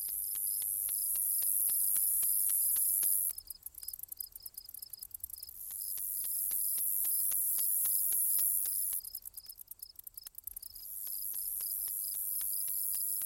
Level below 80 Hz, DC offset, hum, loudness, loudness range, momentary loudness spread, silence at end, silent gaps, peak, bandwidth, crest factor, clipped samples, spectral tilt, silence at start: -68 dBFS; under 0.1%; none; -30 LUFS; 9 LU; 18 LU; 0 s; none; -16 dBFS; 17 kHz; 20 dB; under 0.1%; 2.5 dB/octave; 0 s